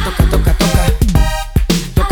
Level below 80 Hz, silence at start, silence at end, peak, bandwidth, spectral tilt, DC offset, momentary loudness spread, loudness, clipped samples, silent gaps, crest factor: -14 dBFS; 0 s; 0 s; 0 dBFS; 19.5 kHz; -5.5 dB/octave; under 0.1%; 3 LU; -14 LUFS; under 0.1%; none; 12 dB